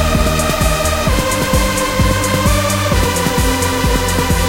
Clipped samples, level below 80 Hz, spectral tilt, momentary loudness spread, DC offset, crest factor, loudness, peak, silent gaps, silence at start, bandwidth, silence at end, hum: under 0.1%; -20 dBFS; -4 dB/octave; 1 LU; under 0.1%; 14 dB; -14 LUFS; 0 dBFS; none; 0 s; 17 kHz; 0 s; none